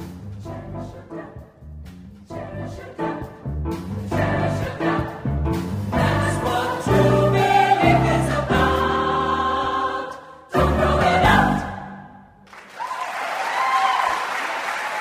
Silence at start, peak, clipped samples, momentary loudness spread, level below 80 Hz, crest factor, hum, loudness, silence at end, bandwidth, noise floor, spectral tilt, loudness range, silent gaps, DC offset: 0 s; -4 dBFS; under 0.1%; 19 LU; -36 dBFS; 18 dB; none; -21 LUFS; 0 s; 15.5 kHz; -45 dBFS; -6 dB/octave; 12 LU; none; under 0.1%